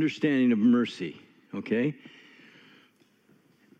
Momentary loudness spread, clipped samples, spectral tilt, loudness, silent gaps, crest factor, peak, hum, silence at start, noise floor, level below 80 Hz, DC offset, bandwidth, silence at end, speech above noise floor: 17 LU; under 0.1%; -7 dB/octave; -26 LUFS; none; 14 dB; -14 dBFS; none; 0 s; -63 dBFS; -78 dBFS; under 0.1%; 7.8 kHz; 1.85 s; 37 dB